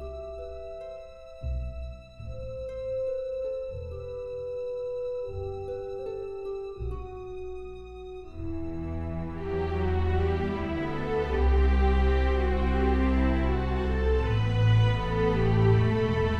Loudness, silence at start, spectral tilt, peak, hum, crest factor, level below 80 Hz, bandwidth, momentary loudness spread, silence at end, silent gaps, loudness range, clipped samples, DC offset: -29 LUFS; 0 s; -8.5 dB/octave; -10 dBFS; none; 16 dB; -32 dBFS; 6.8 kHz; 16 LU; 0 s; none; 12 LU; under 0.1%; under 0.1%